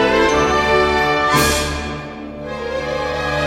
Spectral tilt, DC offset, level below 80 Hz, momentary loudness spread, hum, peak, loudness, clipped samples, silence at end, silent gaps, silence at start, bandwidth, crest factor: -4 dB/octave; under 0.1%; -32 dBFS; 14 LU; none; -4 dBFS; -16 LUFS; under 0.1%; 0 s; none; 0 s; 16 kHz; 14 dB